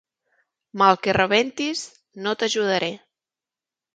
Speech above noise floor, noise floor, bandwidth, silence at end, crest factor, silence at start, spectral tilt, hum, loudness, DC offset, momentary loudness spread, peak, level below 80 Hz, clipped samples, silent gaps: 68 dB; -90 dBFS; 9.4 kHz; 1 s; 24 dB; 0.75 s; -3.5 dB/octave; none; -21 LUFS; under 0.1%; 17 LU; 0 dBFS; -58 dBFS; under 0.1%; none